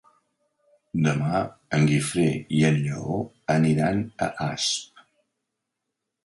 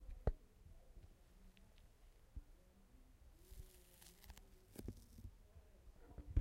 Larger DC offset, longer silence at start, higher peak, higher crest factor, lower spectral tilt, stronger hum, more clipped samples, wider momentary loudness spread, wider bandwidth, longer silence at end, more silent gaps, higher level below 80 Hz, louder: neither; first, 0.95 s vs 0 s; first, -8 dBFS vs -24 dBFS; second, 18 dB vs 28 dB; about the same, -5.5 dB/octave vs -6.5 dB/octave; neither; neither; second, 8 LU vs 21 LU; second, 11.5 kHz vs 16 kHz; first, 1.4 s vs 0 s; neither; about the same, -56 dBFS vs -56 dBFS; first, -24 LUFS vs -56 LUFS